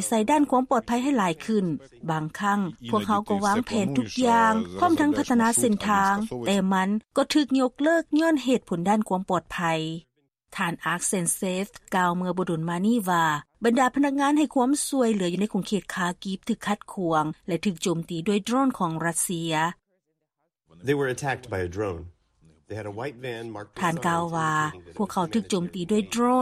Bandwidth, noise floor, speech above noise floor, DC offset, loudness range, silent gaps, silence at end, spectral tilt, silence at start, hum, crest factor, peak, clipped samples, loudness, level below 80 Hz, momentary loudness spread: 14.5 kHz; -78 dBFS; 54 dB; under 0.1%; 7 LU; none; 0 s; -4.5 dB/octave; 0 s; none; 16 dB; -10 dBFS; under 0.1%; -25 LUFS; -58 dBFS; 9 LU